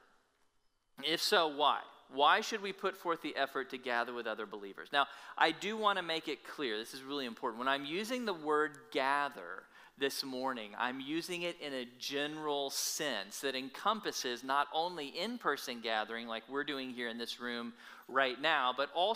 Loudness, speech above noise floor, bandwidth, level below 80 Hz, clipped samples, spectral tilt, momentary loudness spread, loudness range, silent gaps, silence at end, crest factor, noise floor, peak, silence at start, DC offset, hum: -36 LUFS; 38 dB; 16 kHz; -84 dBFS; under 0.1%; -2 dB/octave; 9 LU; 4 LU; none; 0 s; 22 dB; -75 dBFS; -14 dBFS; 1 s; under 0.1%; none